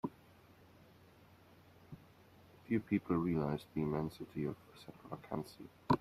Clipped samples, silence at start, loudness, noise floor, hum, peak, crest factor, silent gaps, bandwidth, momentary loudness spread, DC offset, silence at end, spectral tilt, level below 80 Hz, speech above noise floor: under 0.1%; 0.05 s; -39 LUFS; -63 dBFS; none; -16 dBFS; 24 dB; none; 15 kHz; 22 LU; under 0.1%; 0 s; -8.5 dB/octave; -66 dBFS; 24 dB